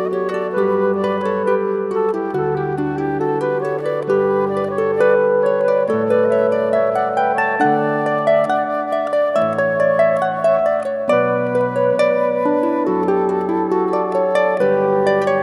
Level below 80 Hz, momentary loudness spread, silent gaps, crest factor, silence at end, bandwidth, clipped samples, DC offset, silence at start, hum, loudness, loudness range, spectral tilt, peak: -58 dBFS; 5 LU; none; 14 dB; 0 s; 11.5 kHz; under 0.1%; under 0.1%; 0 s; none; -17 LUFS; 3 LU; -7.5 dB/octave; -2 dBFS